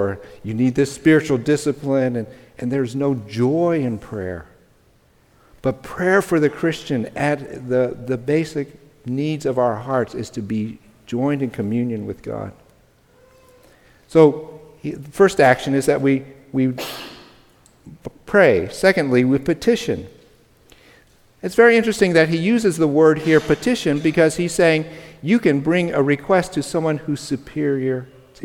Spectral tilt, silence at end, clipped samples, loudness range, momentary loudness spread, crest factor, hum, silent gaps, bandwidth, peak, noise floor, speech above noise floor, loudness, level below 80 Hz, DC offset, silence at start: -6 dB/octave; 0 s; under 0.1%; 7 LU; 15 LU; 18 dB; none; none; 17 kHz; 0 dBFS; -56 dBFS; 37 dB; -19 LUFS; -52 dBFS; under 0.1%; 0 s